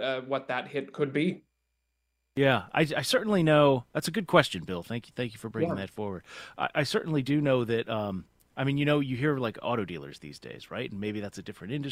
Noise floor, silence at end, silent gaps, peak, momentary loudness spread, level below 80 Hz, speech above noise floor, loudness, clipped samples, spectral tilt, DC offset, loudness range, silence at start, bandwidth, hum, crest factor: -79 dBFS; 0 s; none; -4 dBFS; 16 LU; -62 dBFS; 50 dB; -29 LUFS; under 0.1%; -6 dB/octave; under 0.1%; 5 LU; 0 s; 16 kHz; none; 24 dB